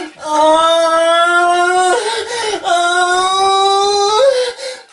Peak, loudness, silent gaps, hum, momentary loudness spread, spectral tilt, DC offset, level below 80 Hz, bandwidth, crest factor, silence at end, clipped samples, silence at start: -2 dBFS; -12 LUFS; none; none; 8 LU; -0.5 dB/octave; under 0.1%; -54 dBFS; 11.5 kHz; 12 dB; 0.1 s; under 0.1%; 0 s